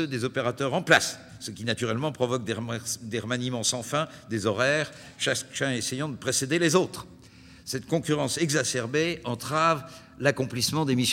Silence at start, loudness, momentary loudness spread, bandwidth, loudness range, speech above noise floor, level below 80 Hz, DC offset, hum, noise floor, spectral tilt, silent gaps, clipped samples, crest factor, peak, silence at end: 0 s; -27 LUFS; 9 LU; 16.5 kHz; 2 LU; 23 dB; -62 dBFS; under 0.1%; none; -50 dBFS; -3.5 dB/octave; none; under 0.1%; 22 dB; -6 dBFS; 0 s